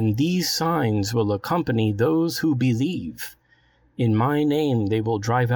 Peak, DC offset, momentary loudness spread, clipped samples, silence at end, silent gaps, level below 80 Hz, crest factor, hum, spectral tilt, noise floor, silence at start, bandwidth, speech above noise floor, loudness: -8 dBFS; under 0.1%; 6 LU; under 0.1%; 0 s; none; -54 dBFS; 14 dB; none; -6 dB/octave; -60 dBFS; 0 s; 19 kHz; 38 dB; -22 LUFS